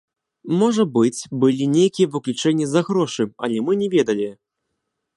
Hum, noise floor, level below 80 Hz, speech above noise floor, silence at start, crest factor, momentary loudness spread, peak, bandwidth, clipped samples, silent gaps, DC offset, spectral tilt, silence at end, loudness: none; -77 dBFS; -68 dBFS; 58 dB; 0.45 s; 16 dB; 6 LU; -4 dBFS; 11.5 kHz; under 0.1%; none; under 0.1%; -6 dB/octave; 0.85 s; -20 LUFS